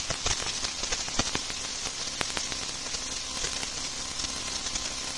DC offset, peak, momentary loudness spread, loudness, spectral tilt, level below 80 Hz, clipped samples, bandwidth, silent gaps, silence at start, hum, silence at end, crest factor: 0.3%; -4 dBFS; 4 LU; -30 LUFS; -0.5 dB/octave; -46 dBFS; under 0.1%; 11.5 kHz; none; 0 s; none; 0 s; 28 dB